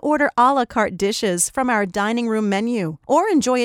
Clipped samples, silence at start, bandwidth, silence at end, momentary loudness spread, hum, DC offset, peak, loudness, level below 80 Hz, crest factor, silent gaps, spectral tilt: under 0.1%; 0.05 s; 17 kHz; 0 s; 5 LU; none; under 0.1%; -4 dBFS; -19 LUFS; -54 dBFS; 14 dB; none; -4 dB/octave